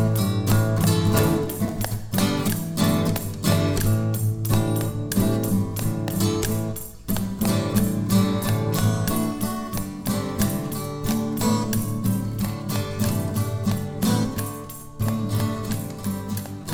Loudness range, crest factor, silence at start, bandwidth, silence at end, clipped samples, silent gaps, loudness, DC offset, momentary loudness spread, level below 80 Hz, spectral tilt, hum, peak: 3 LU; 16 dB; 0 s; over 20 kHz; 0 s; under 0.1%; none; -24 LUFS; under 0.1%; 8 LU; -40 dBFS; -6 dB/octave; none; -6 dBFS